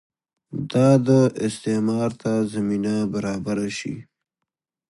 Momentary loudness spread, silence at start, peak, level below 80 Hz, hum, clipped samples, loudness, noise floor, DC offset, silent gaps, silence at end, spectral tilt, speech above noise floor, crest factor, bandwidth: 14 LU; 0.5 s; -4 dBFS; -58 dBFS; none; under 0.1%; -22 LUFS; -84 dBFS; under 0.1%; none; 0.9 s; -7 dB/octave; 63 dB; 18 dB; 11.5 kHz